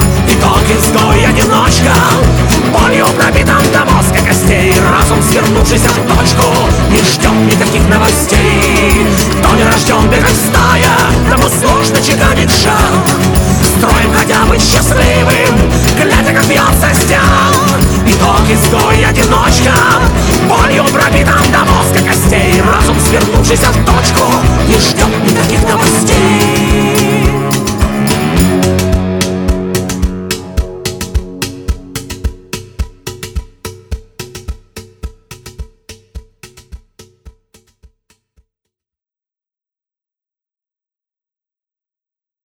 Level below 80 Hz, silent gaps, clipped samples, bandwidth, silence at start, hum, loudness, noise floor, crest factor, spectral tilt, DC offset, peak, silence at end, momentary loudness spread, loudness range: -18 dBFS; none; under 0.1%; over 20 kHz; 0 s; none; -8 LUFS; under -90 dBFS; 10 dB; -4.5 dB/octave; under 0.1%; 0 dBFS; 5.2 s; 12 LU; 13 LU